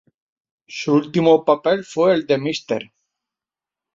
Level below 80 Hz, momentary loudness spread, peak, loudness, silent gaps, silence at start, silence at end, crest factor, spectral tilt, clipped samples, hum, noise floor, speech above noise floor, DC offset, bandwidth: -64 dBFS; 11 LU; -2 dBFS; -18 LUFS; none; 0.7 s; 1.1 s; 18 dB; -6 dB/octave; under 0.1%; none; -89 dBFS; 71 dB; under 0.1%; 7.6 kHz